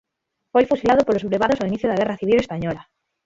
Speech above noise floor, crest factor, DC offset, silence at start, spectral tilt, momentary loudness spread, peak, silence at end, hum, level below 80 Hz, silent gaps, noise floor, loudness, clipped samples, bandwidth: 59 dB; 18 dB; under 0.1%; 0.55 s; -6.5 dB/octave; 9 LU; -4 dBFS; 0.45 s; none; -50 dBFS; none; -78 dBFS; -20 LUFS; under 0.1%; 7.8 kHz